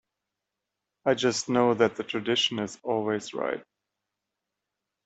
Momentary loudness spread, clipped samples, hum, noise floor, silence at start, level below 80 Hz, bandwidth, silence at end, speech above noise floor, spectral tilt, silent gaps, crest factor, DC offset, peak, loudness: 8 LU; under 0.1%; none; -86 dBFS; 1.05 s; -72 dBFS; 8.4 kHz; 1.45 s; 59 dB; -4 dB/octave; none; 22 dB; under 0.1%; -6 dBFS; -27 LUFS